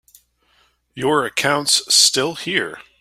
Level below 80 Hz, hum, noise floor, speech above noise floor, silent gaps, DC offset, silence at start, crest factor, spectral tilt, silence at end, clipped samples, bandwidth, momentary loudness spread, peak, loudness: -60 dBFS; none; -60 dBFS; 42 dB; none; under 0.1%; 0.95 s; 20 dB; -1.5 dB/octave; 0.2 s; under 0.1%; 16 kHz; 10 LU; 0 dBFS; -16 LUFS